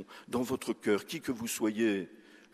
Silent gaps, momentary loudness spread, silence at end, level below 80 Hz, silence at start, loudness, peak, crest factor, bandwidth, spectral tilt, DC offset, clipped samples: none; 7 LU; 0.2 s; -70 dBFS; 0 s; -33 LUFS; -16 dBFS; 18 dB; 14.5 kHz; -4.5 dB/octave; under 0.1%; under 0.1%